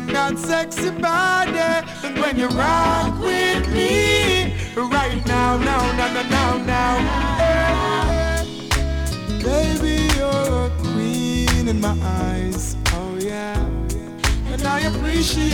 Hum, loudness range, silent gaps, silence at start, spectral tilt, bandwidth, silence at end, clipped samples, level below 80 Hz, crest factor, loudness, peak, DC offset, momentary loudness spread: none; 4 LU; none; 0 s; -4.5 dB/octave; 18.5 kHz; 0 s; under 0.1%; -26 dBFS; 16 dB; -20 LUFS; -4 dBFS; under 0.1%; 7 LU